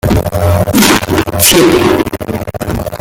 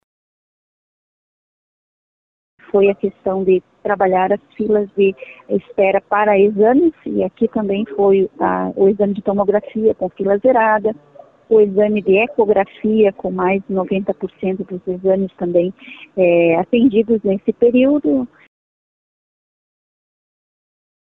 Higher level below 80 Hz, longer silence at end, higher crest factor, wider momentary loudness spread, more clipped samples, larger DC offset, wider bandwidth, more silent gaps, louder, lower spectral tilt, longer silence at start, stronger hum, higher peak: first, -28 dBFS vs -54 dBFS; second, 0 s vs 2.75 s; about the same, 10 dB vs 14 dB; first, 12 LU vs 9 LU; first, 0.3% vs under 0.1%; neither; first, over 20 kHz vs 3.9 kHz; neither; first, -10 LUFS vs -16 LUFS; second, -4 dB/octave vs -10 dB/octave; second, 0.05 s vs 2.75 s; neither; first, 0 dBFS vs -4 dBFS